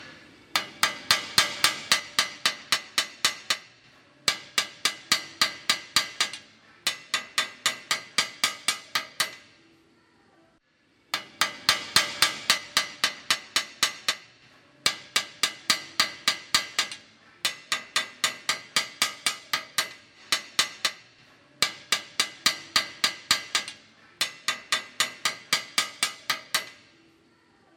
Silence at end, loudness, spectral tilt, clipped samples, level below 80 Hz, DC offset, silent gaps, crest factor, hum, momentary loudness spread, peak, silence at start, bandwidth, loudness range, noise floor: 1.05 s; -26 LUFS; 1 dB/octave; under 0.1%; -70 dBFS; under 0.1%; none; 28 dB; none; 7 LU; -2 dBFS; 0 s; 16.5 kHz; 4 LU; -65 dBFS